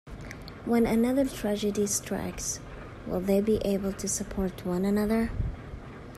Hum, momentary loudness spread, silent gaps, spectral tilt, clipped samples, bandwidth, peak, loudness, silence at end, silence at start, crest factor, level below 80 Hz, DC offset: none; 17 LU; none; -5 dB/octave; under 0.1%; 15 kHz; -14 dBFS; -28 LUFS; 0 s; 0.05 s; 16 dB; -44 dBFS; under 0.1%